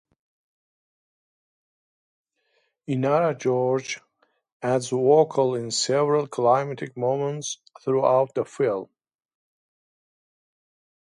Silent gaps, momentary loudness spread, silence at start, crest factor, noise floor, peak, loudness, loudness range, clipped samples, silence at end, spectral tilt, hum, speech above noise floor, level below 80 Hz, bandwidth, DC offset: 4.52-4.60 s; 13 LU; 2.9 s; 20 dB; -71 dBFS; -6 dBFS; -23 LUFS; 6 LU; under 0.1%; 2.25 s; -5 dB/octave; none; 48 dB; -74 dBFS; 11.5 kHz; under 0.1%